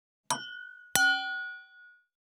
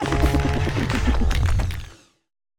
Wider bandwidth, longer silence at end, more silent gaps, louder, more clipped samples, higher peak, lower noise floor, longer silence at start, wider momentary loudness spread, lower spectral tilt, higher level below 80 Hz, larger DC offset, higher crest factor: first, 19.5 kHz vs 17 kHz; second, 0.5 s vs 0.65 s; neither; second, -29 LUFS vs -23 LUFS; neither; about the same, -4 dBFS vs -6 dBFS; first, -57 dBFS vs -42 dBFS; first, 0.3 s vs 0 s; first, 19 LU vs 10 LU; second, 0 dB/octave vs -6 dB/octave; second, -74 dBFS vs -24 dBFS; neither; first, 30 dB vs 16 dB